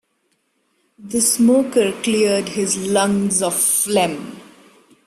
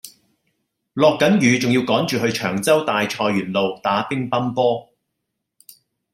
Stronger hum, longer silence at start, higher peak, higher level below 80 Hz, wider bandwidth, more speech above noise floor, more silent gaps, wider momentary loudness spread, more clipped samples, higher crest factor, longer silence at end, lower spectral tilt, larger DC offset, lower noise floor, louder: neither; first, 1 s vs 0.05 s; about the same, -4 dBFS vs -2 dBFS; about the same, -58 dBFS vs -62 dBFS; about the same, 16 kHz vs 16 kHz; second, 50 dB vs 60 dB; neither; about the same, 7 LU vs 6 LU; neither; about the same, 16 dB vs 18 dB; second, 0.65 s vs 1.3 s; second, -3.5 dB/octave vs -5 dB/octave; neither; second, -67 dBFS vs -78 dBFS; about the same, -17 LUFS vs -19 LUFS